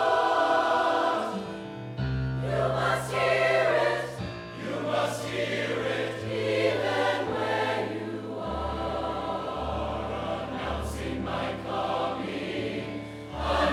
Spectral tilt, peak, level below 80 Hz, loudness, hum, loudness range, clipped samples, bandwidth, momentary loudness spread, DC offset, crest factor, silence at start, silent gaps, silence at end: -5.5 dB/octave; -12 dBFS; -46 dBFS; -28 LUFS; none; 5 LU; under 0.1%; 16 kHz; 11 LU; under 0.1%; 16 dB; 0 s; none; 0 s